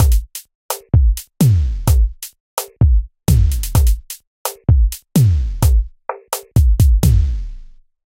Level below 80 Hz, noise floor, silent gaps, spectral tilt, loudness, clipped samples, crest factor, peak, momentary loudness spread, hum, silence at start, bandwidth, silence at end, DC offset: -16 dBFS; -37 dBFS; 0.55-0.69 s, 2.40-2.57 s, 4.27-4.45 s; -6 dB/octave; -17 LUFS; under 0.1%; 14 dB; 0 dBFS; 13 LU; none; 0 s; 17 kHz; 0.55 s; under 0.1%